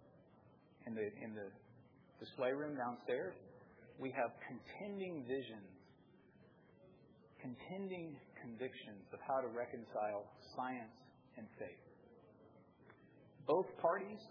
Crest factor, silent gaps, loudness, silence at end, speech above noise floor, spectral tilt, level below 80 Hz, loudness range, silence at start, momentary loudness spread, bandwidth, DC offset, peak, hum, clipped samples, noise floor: 24 dB; none; -45 LUFS; 0 s; 23 dB; -4.5 dB/octave; -86 dBFS; 7 LU; 0 s; 26 LU; 5.4 kHz; under 0.1%; -22 dBFS; none; under 0.1%; -68 dBFS